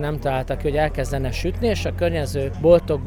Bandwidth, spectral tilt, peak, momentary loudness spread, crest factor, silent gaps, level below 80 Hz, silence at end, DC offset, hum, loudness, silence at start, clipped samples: 17 kHz; -6.5 dB/octave; -4 dBFS; 8 LU; 18 dB; none; -30 dBFS; 0 s; under 0.1%; none; -22 LUFS; 0 s; under 0.1%